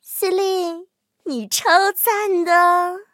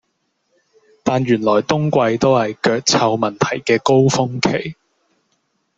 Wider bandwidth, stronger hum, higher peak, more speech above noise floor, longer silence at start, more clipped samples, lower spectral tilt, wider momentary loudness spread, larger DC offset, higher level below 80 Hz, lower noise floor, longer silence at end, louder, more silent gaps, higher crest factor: first, 16.5 kHz vs 8.2 kHz; neither; about the same, 0 dBFS vs -2 dBFS; second, 25 dB vs 53 dB; second, 0.05 s vs 1.05 s; neither; second, -1.5 dB/octave vs -5 dB/octave; first, 14 LU vs 6 LU; neither; second, -80 dBFS vs -54 dBFS; second, -42 dBFS vs -69 dBFS; second, 0.1 s vs 1.05 s; about the same, -17 LUFS vs -16 LUFS; neither; about the same, 18 dB vs 16 dB